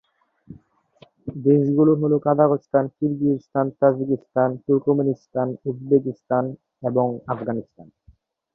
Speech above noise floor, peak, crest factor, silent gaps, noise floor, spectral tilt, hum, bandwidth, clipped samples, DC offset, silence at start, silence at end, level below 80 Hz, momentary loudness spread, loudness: 36 dB; -4 dBFS; 18 dB; none; -57 dBFS; -12 dB/octave; none; 3.4 kHz; under 0.1%; under 0.1%; 0.5 s; 0.7 s; -62 dBFS; 11 LU; -21 LUFS